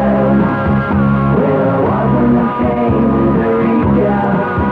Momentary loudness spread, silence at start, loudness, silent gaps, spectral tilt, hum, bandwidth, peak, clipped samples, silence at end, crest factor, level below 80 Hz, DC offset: 3 LU; 0 s; -13 LUFS; none; -10.5 dB/octave; none; 4.7 kHz; -2 dBFS; under 0.1%; 0 s; 10 dB; -30 dBFS; under 0.1%